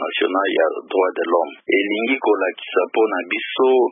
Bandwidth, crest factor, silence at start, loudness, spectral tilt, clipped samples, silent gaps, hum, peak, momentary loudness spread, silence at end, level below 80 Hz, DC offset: 3.7 kHz; 14 dB; 0 s; -19 LUFS; -8.5 dB/octave; under 0.1%; none; none; -4 dBFS; 3 LU; 0 s; -80 dBFS; under 0.1%